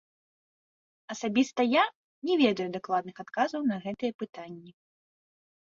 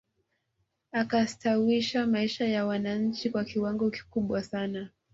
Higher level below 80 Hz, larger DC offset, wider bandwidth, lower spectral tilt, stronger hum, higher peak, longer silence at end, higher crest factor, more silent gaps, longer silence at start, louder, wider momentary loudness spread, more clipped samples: second, -74 dBFS vs -64 dBFS; neither; about the same, 7.6 kHz vs 7.8 kHz; about the same, -5 dB/octave vs -5.5 dB/octave; neither; first, -10 dBFS vs -14 dBFS; first, 1.05 s vs 0.25 s; about the same, 20 dB vs 16 dB; first, 1.95-2.22 s, 4.14-4.19 s vs none; first, 1.1 s vs 0.95 s; about the same, -29 LUFS vs -29 LUFS; first, 16 LU vs 7 LU; neither